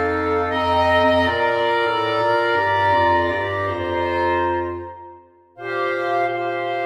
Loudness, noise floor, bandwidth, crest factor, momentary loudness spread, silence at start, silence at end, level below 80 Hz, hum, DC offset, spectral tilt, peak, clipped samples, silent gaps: -19 LUFS; -46 dBFS; 12.5 kHz; 14 dB; 8 LU; 0 s; 0 s; -46 dBFS; none; under 0.1%; -6 dB/octave; -6 dBFS; under 0.1%; none